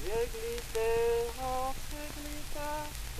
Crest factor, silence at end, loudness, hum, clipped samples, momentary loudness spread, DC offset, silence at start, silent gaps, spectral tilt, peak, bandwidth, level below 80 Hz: 20 dB; 0 s; -35 LUFS; none; under 0.1%; 11 LU; under 0.1%; 0 s; none; -3.5 dB/octave; -14 dBFS; 15 kHz; -42 dBFS